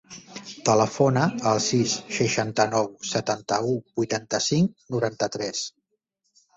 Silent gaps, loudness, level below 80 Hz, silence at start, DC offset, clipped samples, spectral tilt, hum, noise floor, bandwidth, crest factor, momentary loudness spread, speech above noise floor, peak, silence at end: none; -24 LUFS; -62 dBFS; 0.1 s; under 0.1%; under 0.1%; -4.5 dB/octave; none; -76 dBFS; 8.2 kHz; 18 dB; 8 LU; 52 dB; -6 dBFS; 0.9 s